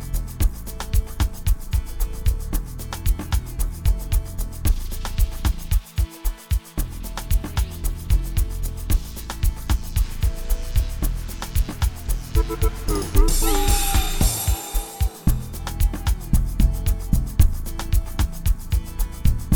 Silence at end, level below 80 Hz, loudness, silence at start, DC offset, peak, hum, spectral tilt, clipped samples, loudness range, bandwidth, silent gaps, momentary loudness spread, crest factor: 0 s; -22 dBFS; -25 LUFS; 0 s; 0.3%; -2 dBFS; none; -4.5 dB/octave; under 0.1%; 4 LU; over 20 kHz; none; 9 LU; 18 dB